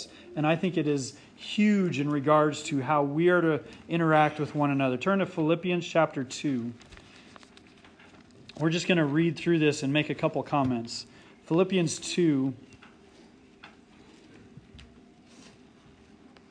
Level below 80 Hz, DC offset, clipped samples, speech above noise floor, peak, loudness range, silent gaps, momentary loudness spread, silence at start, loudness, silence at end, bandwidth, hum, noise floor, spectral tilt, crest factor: -66 dBFS; under 0.1%; under 0.1%; 29 dB; -8 dBFS; 7 LU; none; 10 LU; 0 s; -27 LUFS; 1.7 s; 10.5 kHz; none; -55 dBFS; -6 dB/octave; 20 dB